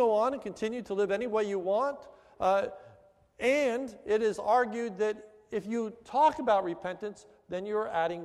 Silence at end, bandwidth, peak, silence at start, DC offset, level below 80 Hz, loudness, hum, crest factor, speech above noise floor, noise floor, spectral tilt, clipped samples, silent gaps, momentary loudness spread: 0 s; 12.5 kHz; -14 dBFS; 0 s; under 0.1%; -68 dBFS; -30 LUFS; none; 16 dB; 30 dB; -60 dBFS; -5 dB/octave; under 0.1%; none; 12 LU